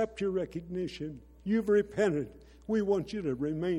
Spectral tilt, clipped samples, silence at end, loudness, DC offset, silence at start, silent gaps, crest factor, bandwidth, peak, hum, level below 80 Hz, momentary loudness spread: -7 dB/octave; under 0.1%; 0 s; -32 LUFS; under 0.1%; 0 s; none; 16 dB; 11.5 kHz; -16 dBFS; none; -56 dBFS; 15 LU